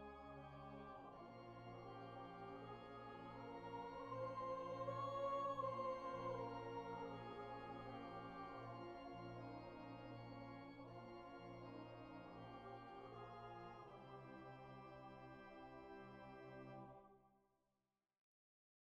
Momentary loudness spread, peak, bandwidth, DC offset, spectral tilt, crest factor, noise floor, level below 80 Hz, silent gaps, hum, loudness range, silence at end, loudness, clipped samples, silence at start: 12 LU; -36 dBFS; 8.4 kHz; under 0.1%; -7 dB/octave; 18 dB; -90 dBFS; -74 dBFS; none; none; 11 LU; 1.45 s; -53 LUFS; under 0.1%; 0 s